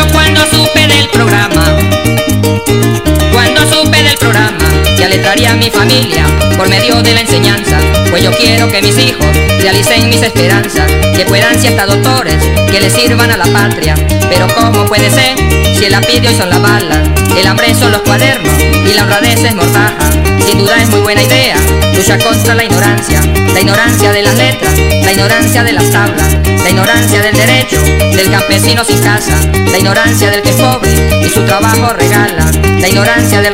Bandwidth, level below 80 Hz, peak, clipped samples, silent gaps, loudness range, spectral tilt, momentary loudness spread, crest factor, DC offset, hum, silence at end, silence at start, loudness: 16.5 kHz; -18 dBFS; 0 dBFS; 0.9%; none; 1 LU; -4 dB/octave; 3 LU; 8 dB; 3%; none; 0 s; 0 s; -7 LUFS